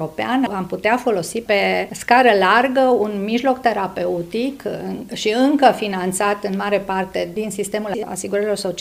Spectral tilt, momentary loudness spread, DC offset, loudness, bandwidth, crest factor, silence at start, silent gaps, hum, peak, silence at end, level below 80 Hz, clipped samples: -4.5 dB/octave; 10 LU; under 0.1%; -19 LUFS; 16 kHz; 18 dB; 0 s; none; none; 0 dBFS; 0 s; -54 dBFS; under 0.1%